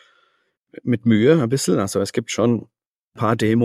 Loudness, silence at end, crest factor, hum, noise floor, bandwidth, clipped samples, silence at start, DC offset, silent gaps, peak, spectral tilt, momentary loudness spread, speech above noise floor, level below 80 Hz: -19 LUFS; 0 s; 18 dB; none; -65 dBFS; 15 kHz; under 0.1%; 0.85 s; under 0.1%; 2.86-3.11 s; -2 dBFS; -6 dB/octave; 9 LU; 47 dB; -60 dBFS